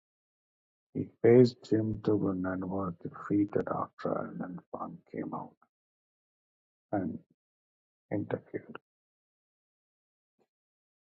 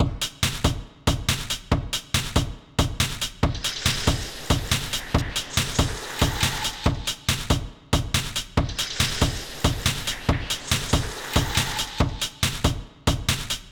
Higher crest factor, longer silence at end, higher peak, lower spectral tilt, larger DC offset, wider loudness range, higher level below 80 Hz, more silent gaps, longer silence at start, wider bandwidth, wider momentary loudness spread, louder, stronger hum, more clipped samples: first, 24 dB vs 18 dB; first, 2.45 s vs 0 s; about the same, -10 dBFS vs -8 dBFS; first, -9 dB/octave vs -3.5 dB/octave; neither; first, 15 LU vs 1 LU; second, -64 dBFS vs -32 dBFS; first, 3.93-3.97 s, 4.66-4.72 s, 5.57-5.61 s, 5.69-6.89 s, 7.34-8.09 s vs none; first, 0.95 s vs 0 s; second, 7.6 kHz vs over 20 kHz; first, 19 LU vs 4 LU; second, -31 LUFS vs -25 LUFS; neither; neither